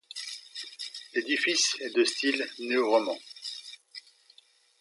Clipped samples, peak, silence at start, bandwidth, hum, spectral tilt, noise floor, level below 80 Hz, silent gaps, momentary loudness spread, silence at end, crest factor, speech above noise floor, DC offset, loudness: under 0.1%; -12 dBFS; 0.15 s; 11.5 kHz; none; -0.5 dB/octave; -61 dBFS; -90 dBFS; none; 17 LU; 0.8 s; 20 dB; 34 dB; under 0.1%; -28 LUFS